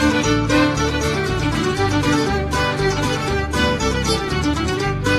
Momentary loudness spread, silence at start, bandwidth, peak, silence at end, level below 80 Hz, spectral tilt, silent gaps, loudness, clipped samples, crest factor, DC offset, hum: 4 LU; 0 s; 14 kHz; -4 dBFS; 0 s; -30 dBFS; -5 dB/octave; none; -19 LUFS; under 0.1%; 16 dB; under 0.1%; none